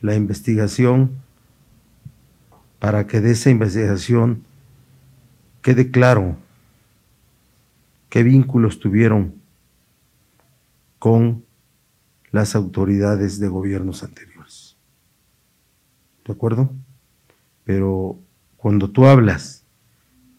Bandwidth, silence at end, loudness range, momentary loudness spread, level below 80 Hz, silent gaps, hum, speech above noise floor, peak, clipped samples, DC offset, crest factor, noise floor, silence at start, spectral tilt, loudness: 13 kHz; 0.85 s; 8 LU; 16 LU; -50 dBFS; none; none; 46 dB; 0 dBFS; under 0.1%; under 0.1%; 20 dB; -62 dBFS; 0 s; -7.5 dB/octave; -17 LUFS